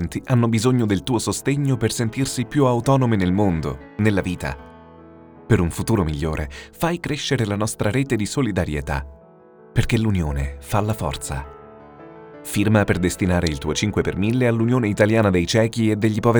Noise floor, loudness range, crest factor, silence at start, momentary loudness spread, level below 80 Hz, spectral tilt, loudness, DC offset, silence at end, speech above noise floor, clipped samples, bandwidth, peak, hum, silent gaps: -48 dBFS; 5 LU; 18 dB; 0 s; 10 LU; -36 dBFS; -6 dB/octave; -21 LUFS; under 0.1%; 0 s; 28 dB; under 0.1%; over 20 kHz; -4 dBFS; none; none